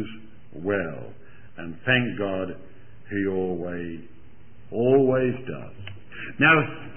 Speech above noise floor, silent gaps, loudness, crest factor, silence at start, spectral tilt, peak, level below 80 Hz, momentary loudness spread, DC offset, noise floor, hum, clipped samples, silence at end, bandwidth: 27 dB; none; -24 LUFS; 22 dB; 0 s; -10.5 dB/octave; -4 dBFS; -56 dBFS; 22 LU; 1%; -52 dBFS; none; under 0.1%; 0 s; 3.3 kHz